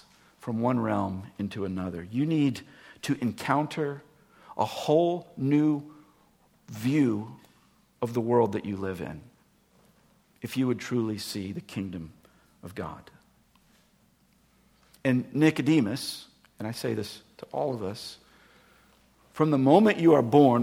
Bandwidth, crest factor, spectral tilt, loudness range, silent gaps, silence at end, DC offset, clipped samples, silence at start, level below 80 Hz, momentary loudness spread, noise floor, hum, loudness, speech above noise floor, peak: 16.5 kHz; 22 dB; -7 dB/octave; 8 LU; none; 0 s; under 0.1%; under 0.1%; 0.45 s; -66 dBFS; 21 LU; -64 dBFS; none; -27 LUFS; 38 dB; -6 dBFS